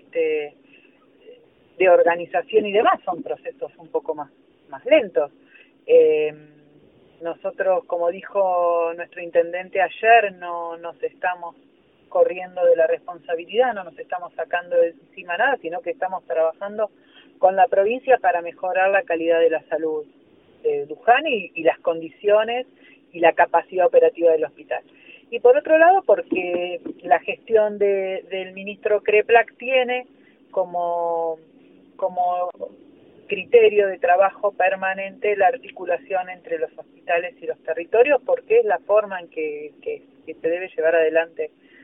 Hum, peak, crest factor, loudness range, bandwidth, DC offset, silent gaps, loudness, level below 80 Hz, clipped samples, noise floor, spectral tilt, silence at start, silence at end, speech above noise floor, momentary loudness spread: none; -2 dBFS; 20 dB; 4 LU; 3.7 kHz; under 0.1%; none; -21 LUFS; -72 dBFS; under 0.1%; -54 dBFS; -8.5 dB/octave; 0.15 s; 0.35 s; 34 dB; 15 LU